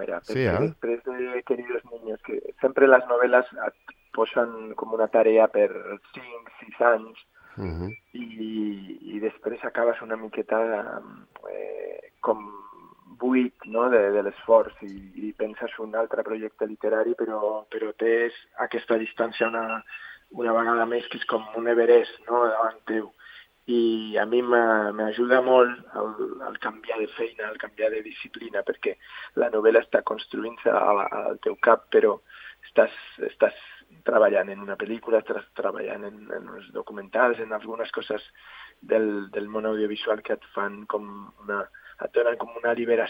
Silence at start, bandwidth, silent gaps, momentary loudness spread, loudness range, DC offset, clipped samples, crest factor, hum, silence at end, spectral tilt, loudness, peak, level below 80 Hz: 0 s; 5.6 kHz; none; 17 LU; 6 LU; under 0.1%; under 0.1%; 24 dB; none; 0 s; -7.5 dB/octave; -25 LUFS; -2 dBFS; -64 dBFS